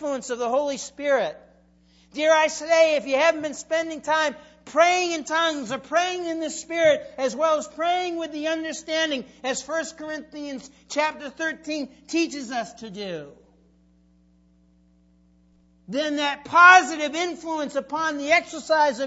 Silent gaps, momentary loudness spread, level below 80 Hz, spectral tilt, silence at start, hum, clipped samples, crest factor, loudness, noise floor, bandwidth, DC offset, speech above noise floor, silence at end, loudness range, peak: none; 13 LU; -64 dBFS; -2 dB/octave; 0 s; none; under 0.1%; 24 dB; -23 LUFS; -59 dBFS; 8 kHz; under 0.1%; 36 dB; 0 s; 12 LU; 0 dBFS